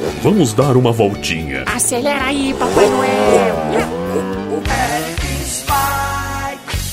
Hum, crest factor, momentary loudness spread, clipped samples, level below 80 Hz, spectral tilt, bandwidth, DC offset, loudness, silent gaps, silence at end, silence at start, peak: none; 16 dB; 8 LU; under 0.1%; -30 dBFS; -4.5 dB/octave; 16 kHz; under 0.1%; -16 LUFS; none; 0 s; 0 s; 0 dBFS